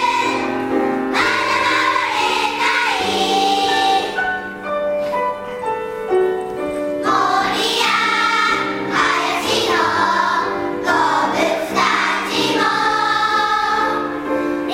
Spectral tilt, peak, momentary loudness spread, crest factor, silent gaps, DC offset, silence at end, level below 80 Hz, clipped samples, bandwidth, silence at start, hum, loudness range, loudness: -2.5 dB/octave; -4 dBFS; 7 LU; 14 dB; none; under 0.1%; 0 s; -52 dBFS; under 0.1%; 16 kHz; 0 s; none; 3 LU; -17 LUFS